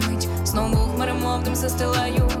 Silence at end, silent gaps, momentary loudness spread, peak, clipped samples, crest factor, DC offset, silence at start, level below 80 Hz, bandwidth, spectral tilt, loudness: 0 s; none; 2 LU; -12 dBFS; under 0.1%; 10 dB; under 0.1%; 0 s; -28 dBFS; 17.5 kHz; -5 dB/octave; -22 LUFS